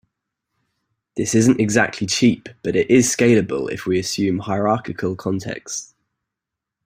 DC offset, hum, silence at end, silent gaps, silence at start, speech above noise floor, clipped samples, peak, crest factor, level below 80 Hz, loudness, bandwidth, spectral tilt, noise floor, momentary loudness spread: under 0.1%; none; 1 s; none; 1.15 s; 66 dB; under 0.1%; -2 dBFS; 18 dB; -54 dBFS; -19 LUFS; 16 kHz; -4.5 dB/octave; -84 dBFS; 11 LU